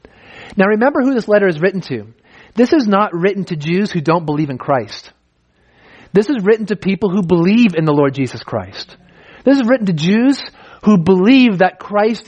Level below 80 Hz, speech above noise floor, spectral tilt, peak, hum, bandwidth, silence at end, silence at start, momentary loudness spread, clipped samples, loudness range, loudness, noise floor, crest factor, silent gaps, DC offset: -54 dBFS; 44 dB; -7 dB/octave; 0 dBFS; none; 9.2 kHz; 0.05 s; 0.35 s; 13 LU; under 0.1%; 4 LU; -14 LUFS; -58 dBFS; 14 dB; none; under 0.1%